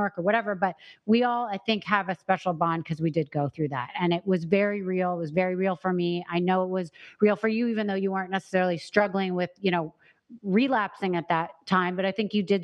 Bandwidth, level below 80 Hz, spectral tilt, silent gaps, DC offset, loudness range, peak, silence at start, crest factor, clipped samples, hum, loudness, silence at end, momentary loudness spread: 9.4 kHz; -70 dBFS; -7.5 dB/octave; none; under 0.1%; 1 LU; -6 dBFS; 0 s; 22 dB; under 0.1%; none; -26 LUFS; 0 s; 6 LU